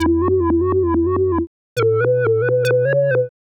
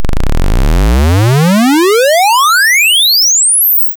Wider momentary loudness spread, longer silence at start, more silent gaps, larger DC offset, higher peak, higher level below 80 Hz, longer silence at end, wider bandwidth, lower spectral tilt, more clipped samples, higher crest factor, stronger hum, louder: second, 4 LU vs 9 LU; about the same, 0 s vs 0 s; first, 1.47-1.76 s vs none; neither; about the same, -8 dBFS vs -6 dBFS; second, -38 dBFS vs -14 dBFS; first, 0.25 s vs 0.05 s; second, 10.5 kHz vs over 20 kHz; first, -8 dB/octave vs -3 dB/octave; neither; first, 8 dB vs 2 dB; neither; second, -17 LUFS vs -7 LUFS